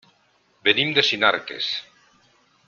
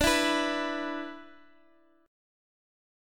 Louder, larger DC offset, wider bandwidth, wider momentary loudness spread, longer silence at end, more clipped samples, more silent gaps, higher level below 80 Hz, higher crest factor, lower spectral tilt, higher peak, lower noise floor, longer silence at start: first, -20 LUFS vs -29 LUFS; neither; second, 7.2 kHz vs 17.5 kHz; second, 9 LU vs 17 LU; second, 0.85 s vs 1.8 s; neither; neither; second, -66 dBFS vs -50 dBFS; about the same, 24 dB vs 22 dB; about the same, -3 dB/octave vs -2.5 dB/octave; first, -2 dBFS vs -12 dBFS; about the same, -63 dBFS vs -64 dBFS; first, 0.65 s vs 0 s